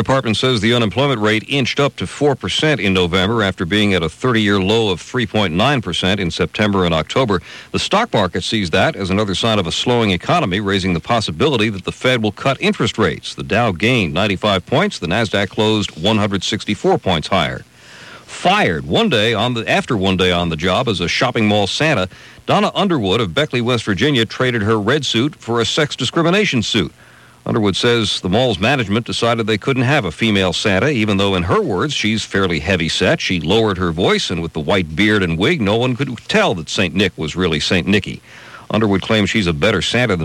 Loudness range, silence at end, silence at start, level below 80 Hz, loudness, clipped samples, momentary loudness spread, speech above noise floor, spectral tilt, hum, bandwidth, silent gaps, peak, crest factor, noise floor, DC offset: 1 LU; 0 s; 0 s; -42 dBFS; -16 LUFS; under 0.1%; 4 LU; 22 dB; -5 dB/octave; none; 14 kHz; none; -2 dBFS; 14 dB; -38 dBFS; under 0.1%